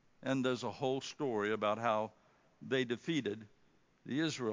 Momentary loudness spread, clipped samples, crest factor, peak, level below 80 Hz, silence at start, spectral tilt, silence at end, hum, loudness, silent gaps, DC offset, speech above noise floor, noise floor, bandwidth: 9 LU; under 0.1%; 20 dB; -18 dBFS; -80 dBFS; 0.2 s; -5 dB/octave; 0 s; none; -37 LUFS; none; under 0.1%; 32 dB; -68 dBFS; 7.6 kHz